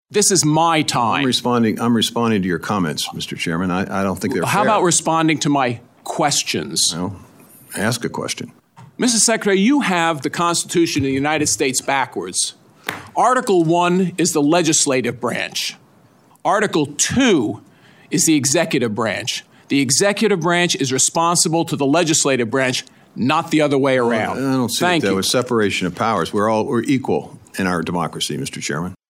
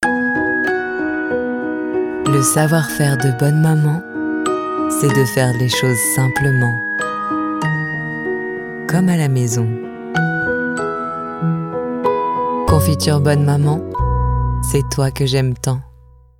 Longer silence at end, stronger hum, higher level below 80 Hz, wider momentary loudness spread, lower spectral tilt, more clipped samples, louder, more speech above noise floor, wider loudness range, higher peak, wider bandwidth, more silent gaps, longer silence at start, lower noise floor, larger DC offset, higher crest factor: second, 0.15 s vs 0.5 s; neither; second, -60 dBFS vs -32 dBFS; about the same, 9 LU vs 7 LU; second, -3.5 dB/octave vs -5.5 dB/octave; neither; about the same, -17 LUFS vs -17 LUFS; first, 34 dB vs 30 dB; about the same, 3 LU vs 3 LU; about the same, 0 dBFS vs 0 dBFS; about the same, 16.5 kHz vs 17 kHz; neither; about the same, 0.1 s vs 0 s; first, -51 dBFS vs -45 dBFS; neither; about the same, 18 dB vs 16 dB